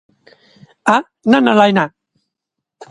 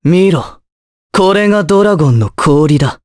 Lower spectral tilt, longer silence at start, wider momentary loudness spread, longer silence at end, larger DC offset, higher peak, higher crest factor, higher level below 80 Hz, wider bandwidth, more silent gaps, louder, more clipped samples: second, -5.5 dB/octave vs -7 dB/octave; first, 0.85 s vs 0.05 s; about the same, 9 LU vs 7 LU; about the same, 0.05 s vs 0.1 s; neither; about the same, 0 dBFS vs 0 dBFS; first, 16 dB vs 10 dB; second, -62 dBFS vs -40 dBFS; about the same, 11 kHz vs 11 kHz; second, none vs 0.72-1.10 s; second, -14 LUFS vs -10 LUFS; neither